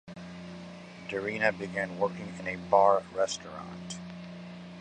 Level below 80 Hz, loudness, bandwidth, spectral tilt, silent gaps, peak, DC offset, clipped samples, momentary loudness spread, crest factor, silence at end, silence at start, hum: -64 dBFS; -30 LUFS; 10 kHz; -4.5 dB/octave; none; -8 dBFS; under 0.1%; under 0.1%; 20 LU; 24 dB; 0 s; 0.05 s; none